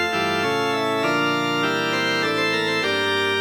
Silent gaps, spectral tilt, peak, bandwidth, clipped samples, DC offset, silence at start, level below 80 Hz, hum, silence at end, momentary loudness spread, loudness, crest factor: none; -4 dB/octave; -8 dBFS; 19.5 kHz; under 0.1%; under 0.1%; 0 s; -66 dBFS; none; 0 s; 1 LU; -21 LUFS; 12 dB